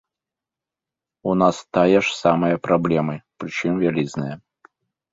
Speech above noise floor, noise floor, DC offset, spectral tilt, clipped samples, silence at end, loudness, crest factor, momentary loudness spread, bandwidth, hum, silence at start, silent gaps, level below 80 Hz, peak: 68 dB; -88 dBFS; under 0.1%; -6.5 dB/octave; under 0.1%; 0.75 s; -20 LUFS; 20 dB; 13 LU; 8 kHz; none; 1.25 s; none; -56 dBFS; -2 dBFS